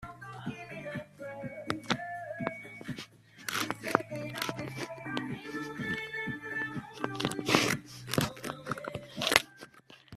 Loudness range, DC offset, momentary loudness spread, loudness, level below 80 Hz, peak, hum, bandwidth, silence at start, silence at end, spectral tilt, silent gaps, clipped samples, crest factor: 6 LU; under 0.1%; 15 LU; -34 LUFS; -64 dBFS; -2 dBFS; none; 15.5 kHz; 0 s; 0 s; -3.5 dB/octave; none; under 0.1%; 34 dB